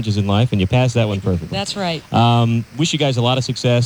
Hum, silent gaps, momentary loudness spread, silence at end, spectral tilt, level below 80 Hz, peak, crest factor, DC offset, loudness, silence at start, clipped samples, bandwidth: none; none; 6 LU; 0 s; -6 dB/octave; -44 dBFS; -4 dBFS; 14 dB; under 0.1%; -17 LUFS; 0 s; under 0.1%; 11 kHz